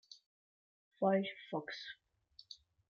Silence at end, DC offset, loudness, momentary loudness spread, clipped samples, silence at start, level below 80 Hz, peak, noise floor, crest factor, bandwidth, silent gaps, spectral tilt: 0.35 s; under 0.1%; -38 LUFS; 24 LU; under 0.1%; 0.1 s; -86 dBFS; -22 dBFS; -60 dBFS; 20 dB; 7 kHz; 0.26-0.91 s; -4.5 dB/octave